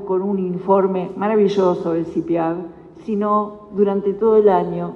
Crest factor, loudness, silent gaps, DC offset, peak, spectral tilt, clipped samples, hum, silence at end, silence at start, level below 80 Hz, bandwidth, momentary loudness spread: 16 dB; -18 LUFS; none; under 0.1%; -2 dBFS; -8.5 dB/octave; under 0.1%; none; 0 s; 0 s; -56 dBFS; 6.8 kHz; 10 LU